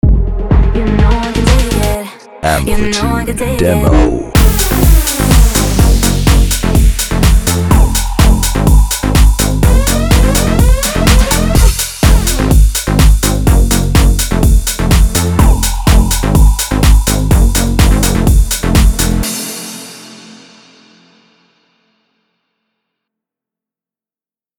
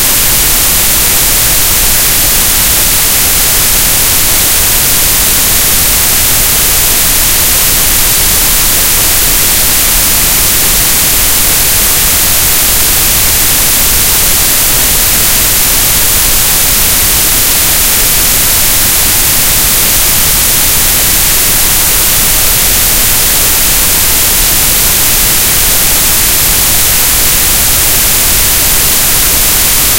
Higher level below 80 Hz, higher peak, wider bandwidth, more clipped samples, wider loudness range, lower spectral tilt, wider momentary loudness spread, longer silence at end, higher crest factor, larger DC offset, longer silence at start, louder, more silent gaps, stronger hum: first, -12 dBFS vs -20 dBFS; about the same, 0 dBFS vs 0 dBFS; about the same, over 20 kHz vs over 20 kHz; second, 0.5% vs 2%; first, 3 LU vs 0 LU; first, -5 dB/octave vs -0.5 dB/octave; first, 4 LU vs 0 LU; first, 4.45 s vs 0 s; about the same, 10 dB vs 8 dB; neither; about the same, 0.05 s vs 0 s; second, -11 LUFS vs -5 LUFS; neither; neither